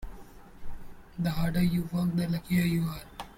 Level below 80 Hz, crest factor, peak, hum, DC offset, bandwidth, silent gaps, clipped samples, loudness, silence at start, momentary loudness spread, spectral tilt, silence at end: -44 dBFS; 14 dB; -16 dBFS; none; under 0.1%; 16.5 kHz; none; under 0.1%; -29 LUFS; 0 s; 22 LU; -7 dB/octave; 0.05 s